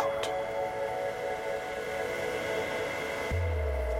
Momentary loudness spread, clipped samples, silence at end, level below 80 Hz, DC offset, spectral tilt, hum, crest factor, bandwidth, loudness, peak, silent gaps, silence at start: 3 LU; under 0.1%; 0 s; -40 dBFS; under 0.1%; -5 dB/octave; none; 18 dB; 16 kHz; -33 LUFS; -14 dBFS; none; 0 s